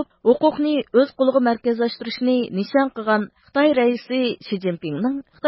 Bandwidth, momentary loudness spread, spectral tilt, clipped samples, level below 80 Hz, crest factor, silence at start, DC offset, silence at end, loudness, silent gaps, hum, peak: 5.8 kHz; 7 LU; -10.5 dB/octave; under 0.1%; -64 dBFS; 16 dB; 0 s; under 0.1%; 0 s; -20 LUFS; none; none; -4 dBFS